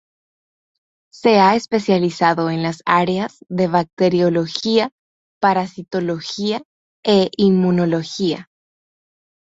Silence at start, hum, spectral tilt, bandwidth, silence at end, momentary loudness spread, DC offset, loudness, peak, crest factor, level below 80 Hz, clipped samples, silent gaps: 1.15 s; none; -6 dB/octave; 8 kHz; 1.1 s; 9 LU; under 0.1%; -18 LUFS; -2 dBFS; 18 dB; -58 dBFS; under 0.1%; 3.93-3.97 s, 4.92-5.41 s, 6.65-7.03 s